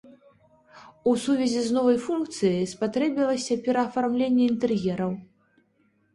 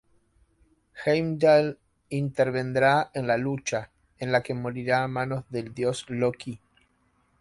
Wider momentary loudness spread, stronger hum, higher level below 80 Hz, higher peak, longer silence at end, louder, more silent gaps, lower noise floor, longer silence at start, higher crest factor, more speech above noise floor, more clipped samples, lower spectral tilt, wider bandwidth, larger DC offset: second, 6 LU vs 13 LU; neither; about the same, -64 dBFS vs -60 dBFS; about the same, -10 dBFS vs -8 dBFS; about the same, 0.9 s vs 0.85 s; about the same, -25 LUFS vs -26 LUFS; neither; about the same, -67 dBFS vs -68 dBFS; second, 0.1 s vs 0.95 s; about the same, 16 dB vs 18 dB; about the same, 43 dB vs 42 dB; neither; about the same, -5.5 dB/octave vs -6 dB/octave; about the same, 11.5 kHz vs 11.5 kHz; neither